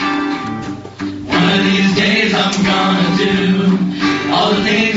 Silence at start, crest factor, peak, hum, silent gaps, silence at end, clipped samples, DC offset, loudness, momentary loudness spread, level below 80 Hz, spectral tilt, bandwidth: 0 s; 14 dB; 0 dBFS; none; none; 0 s; under 0.1%; under 0.1%; -14 LUFS; 12 LU; -46 dBFS; -3.5 dB/octave; 7.8 kHz